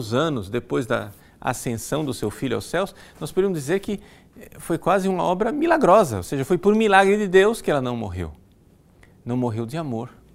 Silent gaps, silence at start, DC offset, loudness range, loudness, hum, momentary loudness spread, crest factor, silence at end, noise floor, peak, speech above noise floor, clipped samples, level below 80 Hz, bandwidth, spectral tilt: none; 0 s; under 0.1%; 8 LU; -22 LUFS; none; 15 LU; 22 dB; 0.25 s; -54 dBFS; 0 dBFS; 33 dB; under 0.1%; -48 dBFS; 16 kHz; -5.5 dB/octave